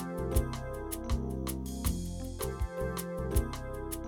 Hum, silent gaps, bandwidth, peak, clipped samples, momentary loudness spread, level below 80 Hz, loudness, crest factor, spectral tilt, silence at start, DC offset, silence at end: none; none; over 20 kHz; -16 dBFS; under 0.1%; 6 LU; -38 dBFS; -36 LUFS; 18 dB; -5.5 dB/octave; 0 s; under 0.1%; 0 s